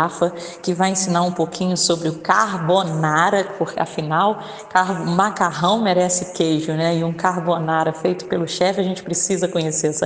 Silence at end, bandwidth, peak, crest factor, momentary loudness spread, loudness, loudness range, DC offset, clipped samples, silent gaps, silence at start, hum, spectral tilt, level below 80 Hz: 0 s; 10 kHz; 0 dBFS; 18 dB; 6 LU; -19 LUFS; 2 LU; under 0.1%; under 0.1%; none; 0 s; none; -4 dB/octave; -60 dBFS